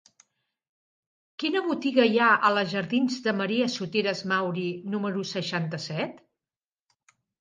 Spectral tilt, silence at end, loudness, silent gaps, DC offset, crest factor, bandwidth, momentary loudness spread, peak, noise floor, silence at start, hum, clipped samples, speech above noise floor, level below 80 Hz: -5 dB/octave; 1.25 s; -26 LUFS; none; under 0.1%; 20 dB; 9.6 kHz; 11 LU; -8 dBFS; under -90 dBFS; 1.4 s; none; under 0.1%; over 64 dB; -76 dBFS